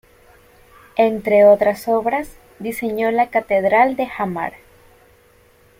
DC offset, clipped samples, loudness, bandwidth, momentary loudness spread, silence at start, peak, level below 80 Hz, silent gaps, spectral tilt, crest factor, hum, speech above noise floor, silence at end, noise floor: under 0.1%; under 0.1%; -17 LUFS; 16.5 kHz; 15 LU; 0.95 s; -2 dBFS; -54 dBFS; none; -6 dB/octave; 16 dB; none; 36 dB; 1.3 s; -52 dBFS